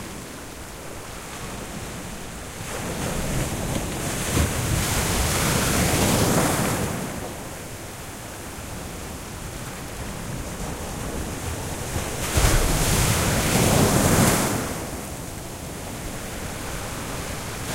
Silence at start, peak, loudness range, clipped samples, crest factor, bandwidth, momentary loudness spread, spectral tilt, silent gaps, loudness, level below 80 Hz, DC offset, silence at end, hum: 0 s; -4 dBFS; 12 LU; under 0.1%; 20 dB; 16 kHz; 15 LU; -4 dB/octave; none; -25 LUFS; -34 dBFS; under 0.1%; 0 s; none